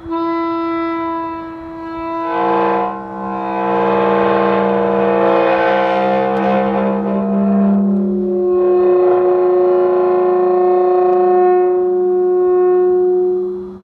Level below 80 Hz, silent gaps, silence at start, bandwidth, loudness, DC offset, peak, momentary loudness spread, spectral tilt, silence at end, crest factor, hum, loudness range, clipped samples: -50 dBFS; none; 0 s; 5 kHz; -14 LUFS; under 0.1%; -4 dBFS; 9 LU; -9.5 dB/octave; 0.05 s; 10 dB; none; 6 LU; under 0.1%